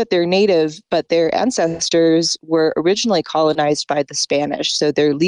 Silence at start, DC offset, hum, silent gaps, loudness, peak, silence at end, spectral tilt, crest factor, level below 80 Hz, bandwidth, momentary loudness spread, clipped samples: 0 s; under 0.1%; none; none; -17 LUFS; -6 dBFS; 0 s; -4 dB/octave; 10 dB; -56 dBFS; 10.5 kHz; 4 LU; under 0.1%